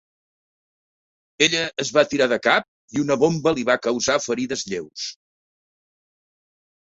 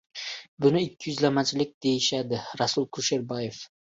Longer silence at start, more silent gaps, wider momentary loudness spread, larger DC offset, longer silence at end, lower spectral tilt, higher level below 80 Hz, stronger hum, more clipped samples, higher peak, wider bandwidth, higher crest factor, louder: first, 1.4 s vs 0.15 s; about the same, 2.68-2.88 s vs 0.48-0.57 s, 1.74-1.81 s; about the same, 11 LU vs 11 LU; neither; first, 1.8 s vs 0.3 s; about the same, -3.5 dB/octave vs -4 dB/octave; about the same, -62 dBFS vs -66 dBFS; neither; neither; first, -2 dBFS vs -8 dBFS; about the same, 8 kHz vs 8 kHz; about the same, 22 dB vs 18 dB; first, -21 LUFS vs -27 LUFS